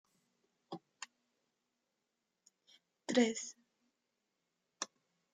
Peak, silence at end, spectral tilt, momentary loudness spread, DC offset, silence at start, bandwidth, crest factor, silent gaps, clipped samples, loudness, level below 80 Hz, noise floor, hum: -18 dBFS; 0.5 s; -3 dB/octave; 20 LU; under 0.1%; 0.7 s; 9.6 kHz; 26 dB; none; under 0.1%; -38 LUFS; under -90 dBFS; -87 dBFS; none